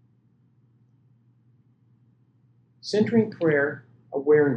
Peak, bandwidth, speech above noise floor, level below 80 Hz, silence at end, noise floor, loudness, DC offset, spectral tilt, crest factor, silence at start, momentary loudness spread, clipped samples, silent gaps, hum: -8 dBFS; 8.6 kHz; 41 dB; -76 dBFS; 0 s; -62 dBFS; -24 LUFS; under 0.1%; -7 dB/octave; 18 dB; 2.85 s; 15 LU; under 0.1%; none; none